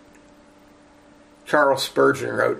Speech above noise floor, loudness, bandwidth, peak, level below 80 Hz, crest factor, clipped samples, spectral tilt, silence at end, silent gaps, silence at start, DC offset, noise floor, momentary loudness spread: 32 dB; -20 LUFS; 15.5 kHz; -2 dBFS; -62 dBFS; 20 dB; under 0.1%; -4 dB/octave; 0 s; none; 1.45 s; under 0.1%; -51 dBFS; 4 LU